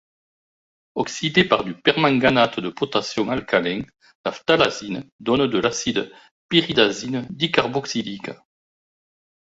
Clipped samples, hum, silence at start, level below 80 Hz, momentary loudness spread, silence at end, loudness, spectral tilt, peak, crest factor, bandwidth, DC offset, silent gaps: under 0.1%; none; 0.95 s; -56 dBFS; 13 LU; 1.2 s; -21 LUFS; -4.5 dB/octave; -2 dBFS; 20 dB; 8 kHz; under 0.1%; 4.15-4.24 s, 5.12-5.19 s, 6.31-6.49 s